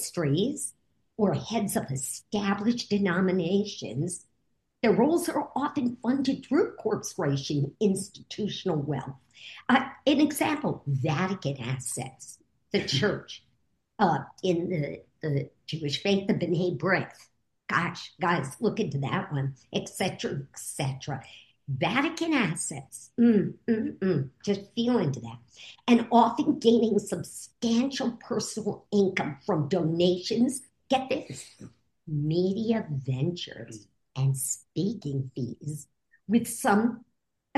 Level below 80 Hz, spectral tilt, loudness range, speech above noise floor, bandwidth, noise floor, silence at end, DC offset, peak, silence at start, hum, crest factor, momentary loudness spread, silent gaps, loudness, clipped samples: -68 dBFS; -5.5 dB/octave; 5 LU; 48 dB; 12.5 kHz; -76 dBFS; 0.6 s; under 0.1%; -8 dBFS; 0 s; none; 20 dB; 13 LU; none; -28 LUFS; under 0.1%